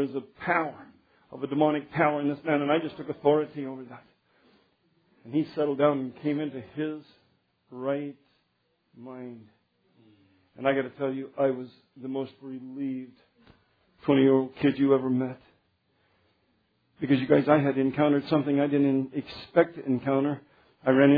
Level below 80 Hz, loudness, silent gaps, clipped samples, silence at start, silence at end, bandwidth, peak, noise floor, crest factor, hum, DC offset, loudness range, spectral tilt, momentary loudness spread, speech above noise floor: -70 dBFS; -27 LUFS; none; under 0.1%; 0 s; 0 s; 5 kHz; -6 dBFS; -73 dBFS; 22 dB; none; under 0.1%; 10 LU; -10 dB/octave; 18 LU; 47 dB